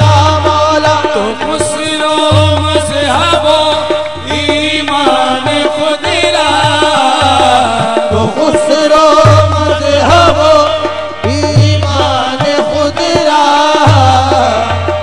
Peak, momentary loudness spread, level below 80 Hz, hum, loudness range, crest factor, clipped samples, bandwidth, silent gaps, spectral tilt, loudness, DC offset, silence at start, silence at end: 0 dBFS; 7 LU; -36 dBFS; none; 2 LU; 10 dB; 2%; 12 kHz; none; -5 dB/octave; -9 LUFS; 3%; 0 s; 0 s